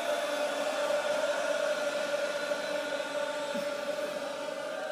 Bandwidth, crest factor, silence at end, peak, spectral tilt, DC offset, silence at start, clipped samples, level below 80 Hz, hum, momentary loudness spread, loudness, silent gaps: 15.5 kHz; 12 dB; 0 s; -20 dBFS; -2 dB/octave; under 0.1%; 0 s; under 0.1%; -80 dBFS; none; 5 LU; -32 LUFS; none